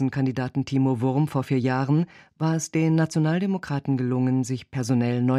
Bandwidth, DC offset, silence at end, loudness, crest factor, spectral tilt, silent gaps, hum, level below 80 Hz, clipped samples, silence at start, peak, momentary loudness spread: 12.5 kHz; under 0.1%; 0 s; -24 LUFS; 14 dB; -7 dB/octave; none; none; -62 dBFS; under 0.1%; 0 s; -10 dBFS; 5 LU